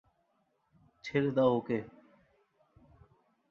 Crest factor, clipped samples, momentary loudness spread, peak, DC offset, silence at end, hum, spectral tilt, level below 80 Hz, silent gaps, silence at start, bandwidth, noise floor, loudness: 22 dB; under 0.1%; 18 LU; -14 dBFS; under 0.1%; 1.6 s; none; -8 dB/octave; -70 dBFS; none; 1.05 s; 7 kHz; -76 dBFS; -31 LUFS